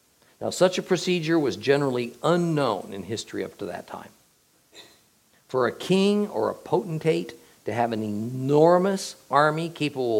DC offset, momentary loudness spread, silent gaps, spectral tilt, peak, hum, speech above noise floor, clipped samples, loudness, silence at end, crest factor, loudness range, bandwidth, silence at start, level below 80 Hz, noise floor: under 0.1%; 12 LU; none; -5.5 dB/octave; -4 dBFS; none; 39 dB; under 0.1%; -24 LUFS; 0 s; 22 dB; 6 LU; 17 kHz; 0.4 s; -72 dBFS; -63 dBFS